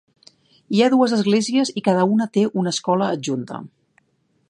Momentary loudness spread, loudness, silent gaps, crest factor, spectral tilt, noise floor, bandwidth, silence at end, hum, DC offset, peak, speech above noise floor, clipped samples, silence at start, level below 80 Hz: 10 LU; -19 LUFS; none; 18 dB; -5.5 dB/octave; -66 dBFS; 11 kHz; 0.85 s; none; under 0.1%; -2 dBFS; 47 dB; under 0.1%; 0.7 s; -70 dBFS